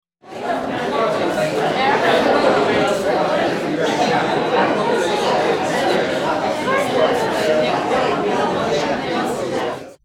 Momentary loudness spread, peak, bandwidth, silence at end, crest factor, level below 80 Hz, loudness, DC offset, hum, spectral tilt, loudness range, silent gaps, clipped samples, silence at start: 6 LU; -2 dBFS; 17 kHz; 0.1 s; 16 dB; -52 dBFS; -18 LUFS; under 0.1%; none; -4.5 dB/octave; 1 LU; none; under 0.1%; 0.25 s